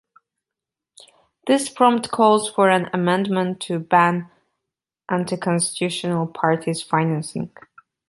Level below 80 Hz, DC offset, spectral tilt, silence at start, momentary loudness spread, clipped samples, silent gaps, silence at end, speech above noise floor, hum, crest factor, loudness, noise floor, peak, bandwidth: -66 dBFS; under 0.1%; -5 dB/octave; 1.45 s; 10 LU; under 0.1%; none; 0.65 s; 67 dB; none; 20 dB; -20 LUFS; -86 dBFS; -2 dBFS; 11.5 kHz